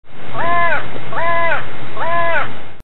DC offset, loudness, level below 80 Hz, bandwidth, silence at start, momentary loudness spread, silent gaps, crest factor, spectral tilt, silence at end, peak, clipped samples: 40%; -19 LUFS; -40 dBFS; 11.5 kHz; 0.05 s; 10 LU; none; 14 dB; -8 dB/octave; 0 s; 0 dBFS; under 0.1%